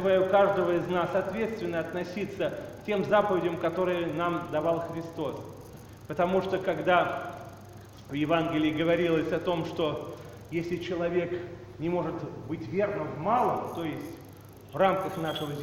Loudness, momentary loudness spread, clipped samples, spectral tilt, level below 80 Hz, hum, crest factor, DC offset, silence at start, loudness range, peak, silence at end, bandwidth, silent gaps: -29 LUFS; 17 LU; under 0.1%; -7 dB/octave; -58 dBFS; none; 20 dB; under 0.1%; 0 s; 3 LU; -10 dBFS; 0 s; 16 kHz; none